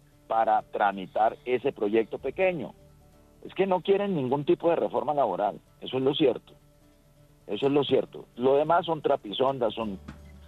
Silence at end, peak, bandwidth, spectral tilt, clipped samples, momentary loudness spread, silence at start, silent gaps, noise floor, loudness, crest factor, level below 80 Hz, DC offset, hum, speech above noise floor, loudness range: 0 s; -10 dBFS; 7.6 kHz; -7.5 dB/octave; under 0.1%; 12 LU; 0.3 s; none; -59 dBFS; -27 LUFS; 16 dB; -60 dBFS; under 0.1%; none; 32 dB; 2 LU